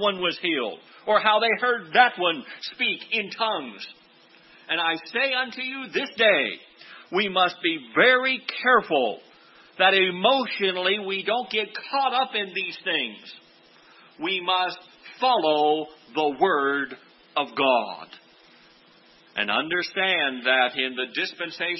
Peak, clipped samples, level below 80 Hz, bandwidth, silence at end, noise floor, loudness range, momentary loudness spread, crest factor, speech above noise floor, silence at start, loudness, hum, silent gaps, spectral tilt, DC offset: -4 dBFS; under 0.1%; -76 dBFS; 6 kHz; 0 s; -55 dBFS; 6 LU; 12 LU; 20 dB; 31 dB; 0 s; -23 LUFS; none; none; -5 dB/octave; under 0.1%